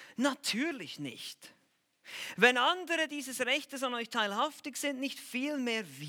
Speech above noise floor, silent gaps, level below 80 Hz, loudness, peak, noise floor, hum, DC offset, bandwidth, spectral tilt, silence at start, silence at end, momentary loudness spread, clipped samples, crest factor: 34 dB; none; under -90 dBFS; -32 LUFS; -8 dBFS; -68 dBFS; none; under 0.1%; 18.5 kHz; -2.5 dB/octave; 0 s; 0 s; 15 LU; under 0.1%; 26 dB